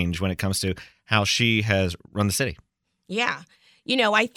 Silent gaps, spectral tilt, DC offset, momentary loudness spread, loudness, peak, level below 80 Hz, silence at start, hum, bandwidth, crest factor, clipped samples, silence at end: none; -4 dB/octave; under 0.1%; 10 LU; -23 LUFS; -4 dBFS; -54 dBFS; 0 s; none; 19 kHz; 22 dB; under 0.1%; 0.1 s